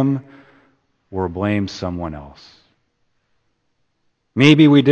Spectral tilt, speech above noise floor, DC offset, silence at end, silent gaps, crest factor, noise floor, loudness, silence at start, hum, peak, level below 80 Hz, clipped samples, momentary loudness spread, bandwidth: -7 dB/octave; 52 dB; under 0.1%; 0 s; none; 18 dB; -67 dBFS; -17 LUFS; 0 s; none; 0 dBFS; -48 dBFS; under 0.1%; 19 LU; 8.6 kHz